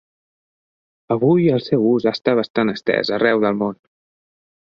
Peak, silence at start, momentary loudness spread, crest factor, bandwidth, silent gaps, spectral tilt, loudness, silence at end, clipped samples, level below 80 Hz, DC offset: -2 dBFS; 1.1 s; 6 LU; 18 dB; 7 kHz; 2.50-2.54 s; -8 dB/octave; -18 LUFS; 1.05 s; under 0.1%; -62 dBFS; under 0.1%